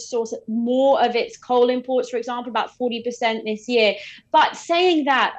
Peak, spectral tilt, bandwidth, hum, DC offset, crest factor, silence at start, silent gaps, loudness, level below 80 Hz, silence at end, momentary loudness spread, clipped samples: -6 dBFS; -3.5 dB/octave; 8.6 kHz; none; under 0.1%; 16 dB; 0 s; none; -21 LUFS; -70 dBFS; 0 s; 9 LU; under 0.1%